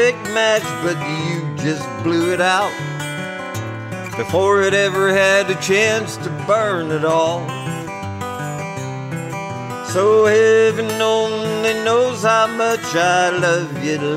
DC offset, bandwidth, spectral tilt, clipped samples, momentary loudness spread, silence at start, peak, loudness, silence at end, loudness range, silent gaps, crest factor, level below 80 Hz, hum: under 0.1%; 16 kHz; -4.5 dB/octave; under 0.1%; 13 LU; 0 s; -4 dBFS; -18 LUFS; 0 s; 5 LU; none; 14 dB; -58 dBFS; none